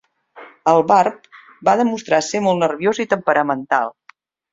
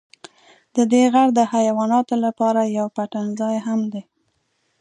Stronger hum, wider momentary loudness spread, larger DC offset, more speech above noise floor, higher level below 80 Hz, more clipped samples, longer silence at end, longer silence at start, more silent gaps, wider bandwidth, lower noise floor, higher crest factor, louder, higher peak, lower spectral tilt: neither; second, 7 LU vs 10 LU; neither; second, 35 dB vs 50 dB; first, -64 dBFS vs -74 dBFS; neither; second, 0.6 s vs 0.8 s; second, 0.35 s vs 0.75 s; neither; second, 7.8 kHz vs 11 kHz; second, -51 dBFS vs -68 dBFS; about the same, 18 dB vs 16 dB; about the same, -17 LUFS vs -19 LUFS; first, 0 dBFS vs -4 dBFS; about the same, -5 dB/octave vs -5.5 dB/octave